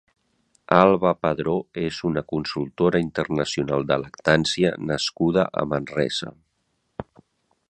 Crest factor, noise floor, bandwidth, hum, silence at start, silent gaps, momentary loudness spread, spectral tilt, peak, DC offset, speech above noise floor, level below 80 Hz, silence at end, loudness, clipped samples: 24 dB; -72 dBFS; 10.5 kHz; none; 0.7 s; none; 11 LU; -5.5 dB/octave; 0 dBFS; under 0.1%; 50 dB; -52 dBFS; 0.65 s; -23 LUFS; under 0.1%